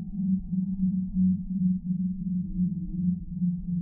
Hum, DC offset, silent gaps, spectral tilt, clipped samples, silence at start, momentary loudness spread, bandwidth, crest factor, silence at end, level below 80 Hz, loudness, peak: none; under 0.1%; none; -21.5 dB/octave; under 0.1%; 0 s; 4 LU; 0.8 kHz; 12 dB; 0 s; -44 dBFS; -29 LUFS; -16 dBFS